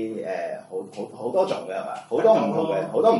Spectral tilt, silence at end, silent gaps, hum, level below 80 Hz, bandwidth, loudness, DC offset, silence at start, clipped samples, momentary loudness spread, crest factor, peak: -6.5 dB/octave; 0 s; none; none; -76 dBFS; 11.5 kHz; -24 LUFS; under 0.1%; 0 s; under 0.1%; 14 LU; 18 dB; -6 dBFS